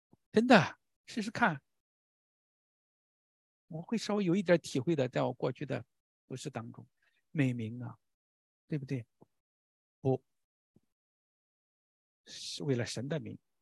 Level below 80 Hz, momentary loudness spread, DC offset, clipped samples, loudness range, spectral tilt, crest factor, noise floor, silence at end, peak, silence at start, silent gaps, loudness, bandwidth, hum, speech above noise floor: -74 dBFS; 17 LU; under 0.1%; under 0.1%; 8 LU; -6 dB/octave; 30 dB; under -90 dBFS; 0.25 s; -6 dBFS; 0.35 s; 0.96-1.04 s, 1.80-3.68 s, 6.00-6.28 s, 8.14-8.68 s, 9.40-10.02 s, 10.44-10.74 s, 10.92-12.24 s; -33 LUFS; 12.5 kHz; none; over 58 dB